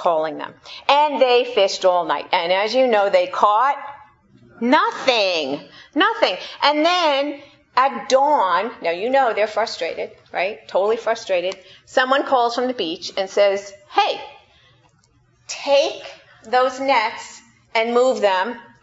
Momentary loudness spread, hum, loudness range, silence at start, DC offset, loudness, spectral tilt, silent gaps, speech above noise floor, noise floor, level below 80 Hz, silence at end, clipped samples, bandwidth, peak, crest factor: 11 LU; none; 4 LU; 0 s; under 0.1%; -19 LUFS; -2.5 dB/octave; none; 39 dB; -58 dBFS; -68 dBFS; 0.2 s; under 0.1%; 8 kHz; 0 dBFS; 20 dB